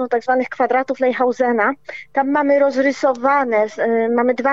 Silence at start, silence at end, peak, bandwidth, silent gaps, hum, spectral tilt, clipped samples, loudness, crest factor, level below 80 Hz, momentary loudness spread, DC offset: 0 s; 0 s; -4 dBFS; 7.8 kHz; none; none; -5 dB/octave; under 0.1%; -17 LUFS; 12 dB; -68 dBFS; 4 LU; 0.3%